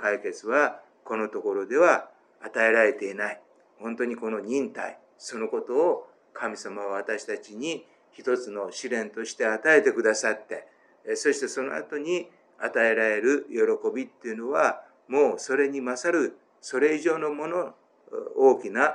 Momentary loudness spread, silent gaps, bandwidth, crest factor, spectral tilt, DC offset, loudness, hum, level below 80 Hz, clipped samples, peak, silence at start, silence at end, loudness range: 16 LU; none; 11 kHz; 20 dB; -3.5 dB/octave; under 0.1%; -26 LUFS; none; under -90 dBFS; under 0.1%; -6 dBFS; 0 s; 0 s; 5 LU